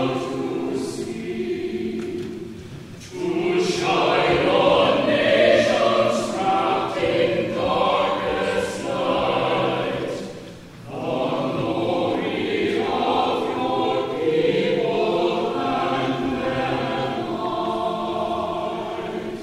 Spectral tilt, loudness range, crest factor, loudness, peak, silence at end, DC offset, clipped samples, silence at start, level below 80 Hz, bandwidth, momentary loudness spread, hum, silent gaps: -5 dB/octave; 6 LU; 18 dB; -22 LUFS; -4 dBFS; 0 s; under 0.1%; under 0.1%; 0 s; -52 dBFS; 14 kHz; 11 LU; none; none